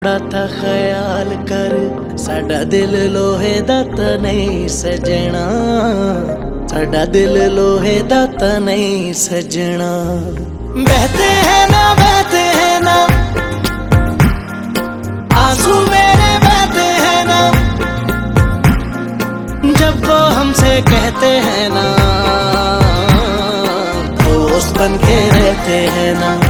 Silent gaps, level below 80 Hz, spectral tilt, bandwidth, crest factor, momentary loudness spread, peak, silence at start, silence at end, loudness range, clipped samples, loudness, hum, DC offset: none; -22 dBFS; -5 dB/octave; 19.5 kHz; 12 dB; 9 LU; 0 dBFS; 0 s; 0 s; 5 LU; under 0.1%; -12 LUFS; none; under 0.1%